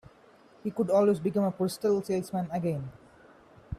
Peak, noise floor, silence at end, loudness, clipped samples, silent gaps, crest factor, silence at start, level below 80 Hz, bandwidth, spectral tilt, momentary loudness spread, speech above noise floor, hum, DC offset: -14 dBFS; -58 dBFS; 0 s; -29 LUFS; under 0.1%; none; 16 dB; 0.65 s; -60 dBFS; 15 kHz; -7.5 dB/octave; 13 LU; 30 dB; none; under 0.1%